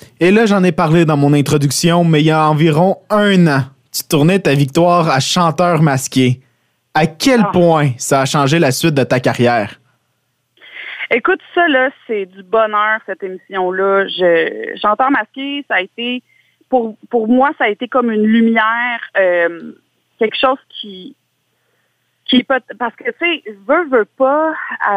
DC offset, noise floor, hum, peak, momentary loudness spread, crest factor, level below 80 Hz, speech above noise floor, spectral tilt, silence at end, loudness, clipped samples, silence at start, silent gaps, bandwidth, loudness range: under 0.1%; -65 dBFS; none; 0 dBFS; 11 LU; 14 dB; -54 dBFS; 52 dB; -5.5 dB/octave; 0 s; -14 LUFS; under 0.1%; 0.2 s; none; 16 kHz; 6 LU